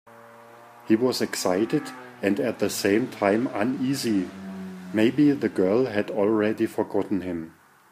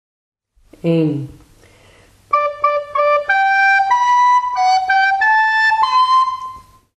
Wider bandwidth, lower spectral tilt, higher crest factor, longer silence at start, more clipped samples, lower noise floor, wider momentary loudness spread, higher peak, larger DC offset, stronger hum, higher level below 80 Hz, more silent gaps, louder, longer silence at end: first, 15.5 kHz vs 9.4 kHz; about the same, -5.5 dB/octave vs -4.5 dB/octave; about the same, 18 dB vs 14 dB; second, 0.1 s vs 0.85 s; neither; about the same, -48 dBFS vs -49 dBFS; first, 12 LU vs 8 LU; second, -6 dBFS vs -2 dBFS; neither; neither; second, -70 dBFS vs -54 dBFS; neither; second, -24 LUFS vs -14 LUFS; about the same, 0.4 s vs 0.35 s